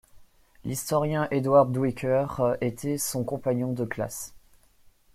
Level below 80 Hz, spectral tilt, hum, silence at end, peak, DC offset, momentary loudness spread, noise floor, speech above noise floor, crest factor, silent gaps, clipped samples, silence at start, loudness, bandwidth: -56 dBFS; -6 dB/octave; none; 0.75 s; -8 dBFS; under 0.1%; 13 LU; -58 dBFS; 33 dB; 20 dB; none; under 0.1%; 0.15 s; -26 LUFS; 15.5 kHz